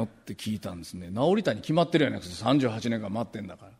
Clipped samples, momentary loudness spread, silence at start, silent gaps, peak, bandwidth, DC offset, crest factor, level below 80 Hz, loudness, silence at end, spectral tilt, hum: under 0.1%; 12 LU; 0 s; none; -8 dBFS; 15.5 kHz; under 0.1%; 20 dB; -60 dBFS; -28 LUFS; 0.1 s; -6 dB/octave; none